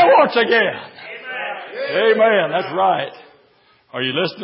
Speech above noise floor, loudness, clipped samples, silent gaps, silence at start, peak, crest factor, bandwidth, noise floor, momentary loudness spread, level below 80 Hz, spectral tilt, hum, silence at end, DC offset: 38 dB; -17 LUFS; under 0.1%; none; 0 s; -2 dBFS; 16 dB; 5.8 kHz; -55 dBFS; 17 LU; -72 dBFS; -9 dB/octave; none; 0 s; under 0.1%